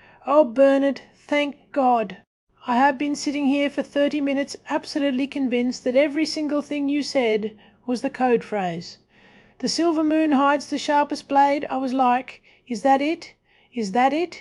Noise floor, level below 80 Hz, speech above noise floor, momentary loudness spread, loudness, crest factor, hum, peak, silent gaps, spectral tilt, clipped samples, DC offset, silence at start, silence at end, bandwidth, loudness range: -53 dBFS; -66 dBFS; 32 dB; 10 LU; -22 LUFS; 18 dB; none; -4 dBFS; 2.27-2.47 s; -4.5 dB/octave; under 0.1%; under 0.1%; 0.25 s; 0 s; 11.5 kHz; 3 LU